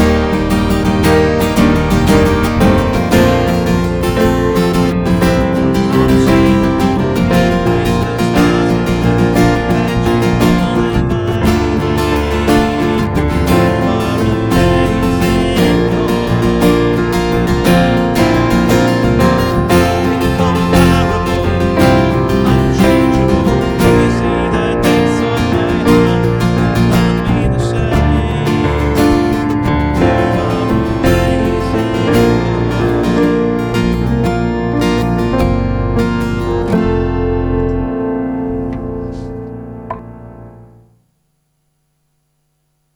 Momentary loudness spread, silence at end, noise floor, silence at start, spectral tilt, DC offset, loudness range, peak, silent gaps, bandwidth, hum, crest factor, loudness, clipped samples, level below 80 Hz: 5 LU; 2.35 s; -63 dBFS; 0 s; -6.5 dB/octave; under 0.1%; 4 LU; 0 dBFS; none; over 20 kHz; none; 12 dB; -13 LUFS; under 0.1%; -24 dBFS